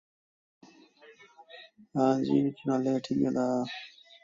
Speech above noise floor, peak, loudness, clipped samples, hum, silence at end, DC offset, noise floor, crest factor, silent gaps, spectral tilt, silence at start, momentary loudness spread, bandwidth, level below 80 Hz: 29 dB; -12 dBFS; -29 LUFS; under 0.1%; none; 0.35 s; under 0.1%; -57 dBFS; 18 dB; none; -7 dB/octave; 1.1 s; 23 LU; 7.6 kHz; -72 dBFS